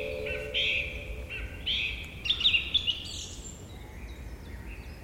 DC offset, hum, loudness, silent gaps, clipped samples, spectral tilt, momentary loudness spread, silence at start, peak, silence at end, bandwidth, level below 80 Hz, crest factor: under 0.1%; none; -29 LUFS; none; under 0.1%; -2.5 dB/octave; 20 LU; 0 s; -14 dBFS; 0 s; 16.5 kHz; -44 dBFS; 20 dB